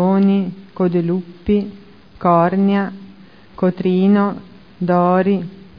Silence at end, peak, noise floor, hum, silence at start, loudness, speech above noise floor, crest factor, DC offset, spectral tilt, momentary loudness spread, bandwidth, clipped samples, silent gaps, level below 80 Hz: 0.2 s; -2 dBFS; -43 dBFS; none; 0 s; -17 LUFS; 27 dB; 16 dB; 0.4%; -11 dB/octave; 12 LU; 5.2 kHz; under 0.1%; none; -46 dBFS